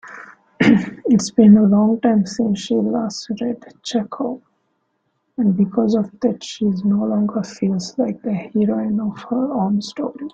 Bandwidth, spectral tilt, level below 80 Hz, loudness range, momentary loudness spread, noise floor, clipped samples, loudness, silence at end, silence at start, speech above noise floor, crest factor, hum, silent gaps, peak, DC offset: 7.8 kHz; -6.5 dB/octave; -58 dBFS; 7 LU; 12 LU; -69 dBFS; under 0.1%; -18 LUFS; 0.05 s; 0.05 s; 51 dB; 16 dB; none; none; -2 dBFS; under 0.1%